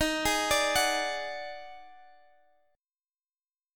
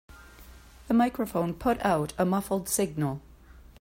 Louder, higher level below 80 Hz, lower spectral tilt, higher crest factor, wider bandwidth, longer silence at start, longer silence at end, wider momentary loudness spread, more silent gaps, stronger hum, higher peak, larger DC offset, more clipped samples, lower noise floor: about the same, -28 LUFS vs -28 LUFS; about the same, -54 dBFS vs -52 dBFS; second, -1.5 dB/octave vs -5.5 dB/octave; about the same, 20 dB vs 18 dB; about the same, 17.5 kHz vs 16 kHz; about the same, 0 s vs 0.1 s; first, 1.75 s vs 0.2 s; first, 18 LU vs 6 LU; neither; neither; about the same, -14 dBFS vs -12 dBFS; neither; neither; first, under -90 dBFS vs -51 dBFS